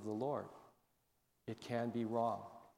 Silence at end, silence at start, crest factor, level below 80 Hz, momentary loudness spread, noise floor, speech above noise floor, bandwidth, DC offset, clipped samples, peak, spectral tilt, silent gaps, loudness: 0.1 s; 0 s; 18 dB; -82 dBFS; 14 LU; -80 dBFS; 40 dB; 16.5 kHz; under 0.1%; under 0.1%; -26 dBFS; -7.5 dB/octave; none; -42 LUFS